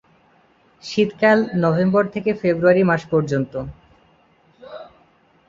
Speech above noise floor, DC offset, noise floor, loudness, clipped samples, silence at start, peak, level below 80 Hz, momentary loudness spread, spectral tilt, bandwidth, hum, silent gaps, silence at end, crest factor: 38 dB; under 0.1%; -56 dBFS; -18 LUFS; under 0.1%; 0.85 s; -2 dBFS; -54 dBFS; 22 LU; -7.5 dB/octave; 7.6 kHz; none; none; 0.65 s; 18 dB